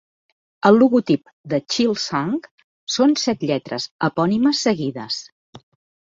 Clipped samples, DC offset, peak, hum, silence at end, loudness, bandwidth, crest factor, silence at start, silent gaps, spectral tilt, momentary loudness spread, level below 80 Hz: under 0.1%; under 0.1%; -2 dBFS; none; 0.55 s; -20 LUFS; 7.8 kHz; 18 dB; 0.65 s; 1.33-1.44 s, 2.51-2.58 s, 2.64-2.87 s, 3.91-3.99 s, 5.32-5.53 s; -5 dB/octave; 12 LU; -62 dBFS